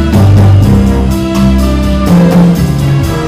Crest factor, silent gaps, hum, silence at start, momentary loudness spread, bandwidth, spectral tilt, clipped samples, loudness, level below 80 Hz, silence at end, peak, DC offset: 6 dB; none; none; 0 s; 5 LU; 15.5 kHz; -7.5 dB/octave; 1%; -8 LUFS; -16 dBFS; 0 s; 0 dBFS; under 0.1%